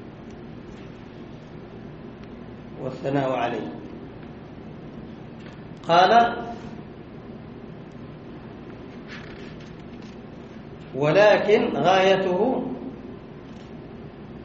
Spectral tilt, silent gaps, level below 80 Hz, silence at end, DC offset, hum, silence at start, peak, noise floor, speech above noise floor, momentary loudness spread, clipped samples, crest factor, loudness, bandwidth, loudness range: -3.5 dB/octave; none; -54 dBFS; 0 s; under 0.1%; none; 0 s; -4 dBFS; -40 dBFS; 21 dB; 23 LU; under 0.1%; 22 dB; -21 LUFS; 7.4 kHz; 18 LU